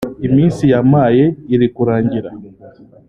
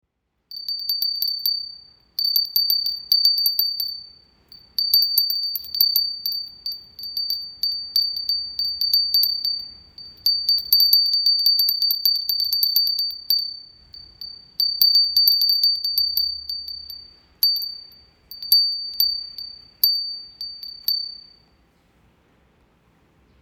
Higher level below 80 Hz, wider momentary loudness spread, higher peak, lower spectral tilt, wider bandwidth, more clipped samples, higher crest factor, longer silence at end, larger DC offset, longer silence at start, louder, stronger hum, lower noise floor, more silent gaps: first, -44 dBFS vs -62 dBFS; second, 8 LU vs 18 LU; about the same, -2 dBFS vs 0 dBFS; first, -9 dB/octave vs 2 dB/octave; second, 10.5 kHz vs over 20 kHz; neither; second, 12 dB vs 22 dB; second, 0.4 s vs 2.25 s; neither; second, 0 s vs 0.5 s; first, -13 LUFS vs -18 LUFS; neither; second, -40 dBFS vs -60 dBFS; neither